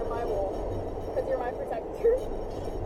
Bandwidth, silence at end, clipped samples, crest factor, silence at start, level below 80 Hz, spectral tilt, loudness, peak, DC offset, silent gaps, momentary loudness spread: 15 kHz; 0 s; under 0.1%; 16 dB; 0 s; -40 dBFS; -7.5 dB/octave; -31 LUFS; -14 dBFS; under 0.1%; none; 9 LU